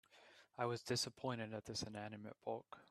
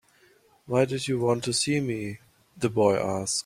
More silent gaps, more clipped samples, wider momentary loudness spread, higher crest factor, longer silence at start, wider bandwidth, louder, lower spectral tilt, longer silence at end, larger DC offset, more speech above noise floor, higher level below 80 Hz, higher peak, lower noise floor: neither; neither; first, 15 LU vs 9 LU; about the same, 20 dB vs 20 dB; second, 0.1 s vs 0.7 s; second, 13.5 kHz vs 15.5 kHz; second, -45 LUFS vs -26 LUFS; about the same, -4 dB/octave vs -4.5 dB/octave; about the same, 0.05 s vs 0.05 s; neither; second, 22 dB vs 35 dB; second, -78 dBFS vs -62 dBFS; second, -26 dBFS vs -8 dBFS; first, -67 dBFS vs -61 dBFS